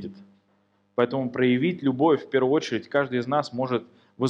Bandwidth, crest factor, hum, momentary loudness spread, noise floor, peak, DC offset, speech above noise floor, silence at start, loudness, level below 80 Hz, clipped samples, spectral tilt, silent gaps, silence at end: 8 kHz; 18 dB; 50 Hz at -55 dBFS; 6 LU; -66 dBFS; -8 dBFS; under 0.1%; 43 dB; 0 s; -24 LUFS; -72 dBFS; under 0.1%; -7 dB/octave; none; 0 s